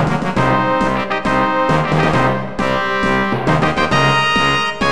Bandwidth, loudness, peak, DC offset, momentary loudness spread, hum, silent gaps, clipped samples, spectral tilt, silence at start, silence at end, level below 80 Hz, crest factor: 12.5 kHz; -15 LUFS; 0 dBFS; 3%; 4 LU; none; none; under 0.1%; -5.5 dB/octave; 0 s; 0 s; -36 dBFS; 14 dB